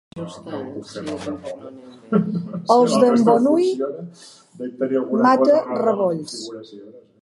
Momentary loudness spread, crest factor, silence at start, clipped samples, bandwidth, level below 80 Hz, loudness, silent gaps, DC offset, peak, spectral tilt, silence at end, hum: 19 LU; 18 dB; 0.15 s; under 0.1%; 11.5 kHz; -64 dBFS; -19 LUFS; none; under 0.1%; -2 dBFS; -6.5 dB/octave; 0.25 s; none